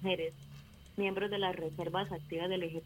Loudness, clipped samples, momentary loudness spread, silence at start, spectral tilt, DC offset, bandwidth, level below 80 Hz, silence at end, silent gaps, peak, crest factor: -37 LUFS; under 0.1%; 16 LU; 0 s; -6 dB/octave; under 0.1%; 16.5 kHz; -64 dBFS; 0 s; none; -20 dBFS; 16 dB